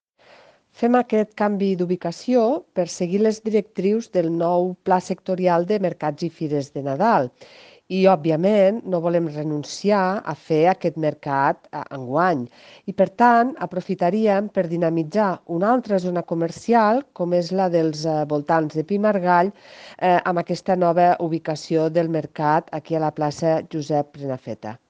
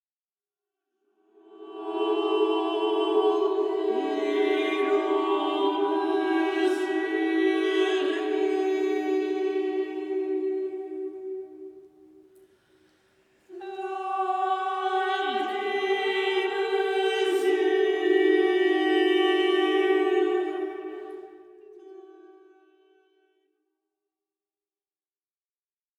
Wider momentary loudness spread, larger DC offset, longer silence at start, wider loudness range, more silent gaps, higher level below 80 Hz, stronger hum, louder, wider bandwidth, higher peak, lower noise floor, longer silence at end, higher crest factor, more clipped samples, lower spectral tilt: second, 9 LU vs 13 LU; neither; second, 0.8 s vs 1.5 s; second, 2 LU vs 11 LU; neither; first, -68 dBFS vs -84 dBFS; neither; first, -21 LUFS vs -25 LUFS; second, 9.4 kHz vs 10.5 kHz; first, -2 dBFS vs -12 dBFS; second, -52 dBFS vs under -90 dBFS; second, 0.15 s vs 3.7 s; about the same, 18 dB vs 16 dB; neither; first, -7 dB/octave vs -2.5 dB/octave